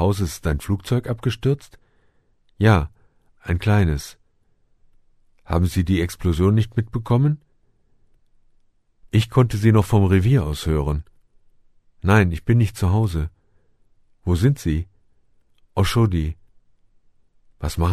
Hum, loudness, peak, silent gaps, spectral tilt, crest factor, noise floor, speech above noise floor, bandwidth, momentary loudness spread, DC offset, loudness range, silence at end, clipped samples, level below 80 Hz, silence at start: none; -21 LUFS; 0 dBFS; none; -7 dB/octave; 22 dB; -61 dBFS; 42 dB; 13.5 kHz; 12 LU; under 0.1%; 4 LU; 0 s; under 0.1%; -34 dBFS; 0 s